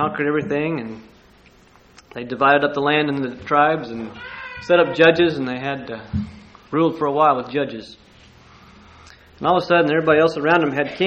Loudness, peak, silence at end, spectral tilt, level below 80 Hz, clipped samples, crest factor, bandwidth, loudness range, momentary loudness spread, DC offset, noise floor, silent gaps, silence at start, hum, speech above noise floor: -19 LUFS; 0 dBFS; 0 s; -6.5 dB/octave; -52 dBFS; under 0.1%; 20 dB; 8.2 kHz; 5 LU; 17 LU; under 0.1%; -51 dBFS; none; 0 s; none; 32 dB